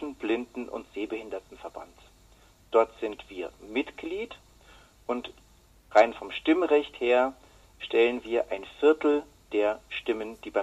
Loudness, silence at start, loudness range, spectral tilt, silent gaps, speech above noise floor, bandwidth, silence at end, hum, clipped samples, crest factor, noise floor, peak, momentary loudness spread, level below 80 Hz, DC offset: -28 LUFS; 0 s; 7 LU; -4.5 dB/octave; none; 30 dB; 12 kHz; 0 s; none; under 0.1%; 24 dB; -58 dBFS; -6 dBFS; 17 LU; -60 dBFS; under 0.1%